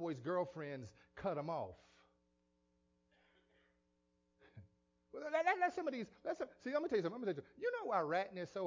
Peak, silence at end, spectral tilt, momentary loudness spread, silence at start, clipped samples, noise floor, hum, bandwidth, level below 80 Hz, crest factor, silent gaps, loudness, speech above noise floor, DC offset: -22 dBFS; 0 s; -6.5 dB/octave; 12 LU; 0 s; under 0.1%; -81 dBFS; none; 7.6 kHz; -76 dBFS; 20 dB; none; -41 LUFS; 40 dB; under 0.1%